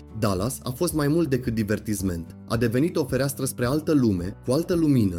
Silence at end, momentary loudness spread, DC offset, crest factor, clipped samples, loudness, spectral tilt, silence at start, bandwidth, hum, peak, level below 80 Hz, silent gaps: 0 s; 7 LU; under 0.1%; 14 dB; under 0.1%; -24 LUFS; -6 dB/octave; 0 s; 17 kHz; none; -10 dBFS; -44 dBFS; none